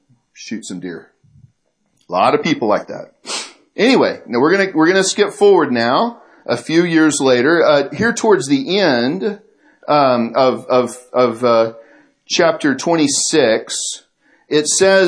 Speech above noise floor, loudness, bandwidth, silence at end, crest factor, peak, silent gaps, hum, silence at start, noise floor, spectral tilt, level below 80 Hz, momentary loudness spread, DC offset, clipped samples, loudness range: 50 dB; -15 LUFS; 11 kHz; 0 s; 16 dB; 0 dBFS; none; none; 0.4 s; -64 dBFS; -3.5 dB/octave; -62 dBFS; 15 LU; under 0.1%; under 0.1%; 4 LU